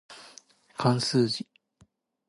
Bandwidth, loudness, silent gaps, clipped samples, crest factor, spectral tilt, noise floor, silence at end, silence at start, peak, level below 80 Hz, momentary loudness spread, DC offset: 11.5 kHz; -27 LUFS; none; under 0.1%; 20 dB; -5.5 dB/octave; -64 dBFS; 0.85 s; 0.1 s; -10 dBFS; -70 dBFS; 22 LU; under 0.1%